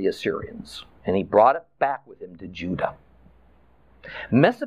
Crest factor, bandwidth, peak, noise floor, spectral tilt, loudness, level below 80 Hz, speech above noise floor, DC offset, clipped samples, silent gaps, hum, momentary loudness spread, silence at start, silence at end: 20 dB; 13 kHz; -4 dBFS; -57 dBFS; -7 dB/octave; -23 LUFS; -56 dBFS; 34 dB; 0.1%; under 0.1%; none; none; 21 LU; 0 s; 0 s